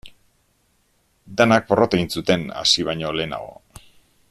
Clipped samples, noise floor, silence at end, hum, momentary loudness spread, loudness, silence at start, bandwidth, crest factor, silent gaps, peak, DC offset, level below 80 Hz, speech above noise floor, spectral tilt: under 0.1%; -64 dBFS; 0.75 s; none; 13 LU; -19 LUFS; 0.05 s; 13.5 kHz; 20 dB; none; -2 dBFS; under 0.1%; -52 dBFS; 44 dB; -4 dB/octave